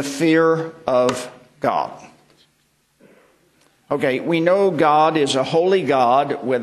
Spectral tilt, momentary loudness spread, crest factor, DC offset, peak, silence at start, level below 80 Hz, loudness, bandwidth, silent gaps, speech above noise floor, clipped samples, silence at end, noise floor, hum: -5 dB/octave; 9 LU; 16 dB; under 0.1%; -4 dBFS; 0 s; -64 dBFS; -18 LUFS; 13 kHz; none; 45 dB; under 0.1%; 0 s; -63 dBFS; none